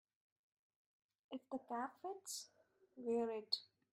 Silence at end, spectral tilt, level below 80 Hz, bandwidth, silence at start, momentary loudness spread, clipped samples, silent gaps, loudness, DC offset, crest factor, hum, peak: 0.25 s; -2 dB/octave; under -90 dBFS; 15.5 kHz; 1.3 s; 12 LU; under 0.1%; none; -45 LUFS; under 0.1%; 24 dB; none; -24 dBFS